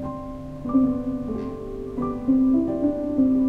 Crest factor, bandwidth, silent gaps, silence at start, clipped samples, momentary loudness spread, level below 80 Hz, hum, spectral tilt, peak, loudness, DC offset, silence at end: 14 dB; 3.4 kHz; none; 0 s; under 0.1%; 13 LU; -42 dBFS; none; -10 dB/octave; -10 dBFS; -24 LUFS; under 0.1%; 0 s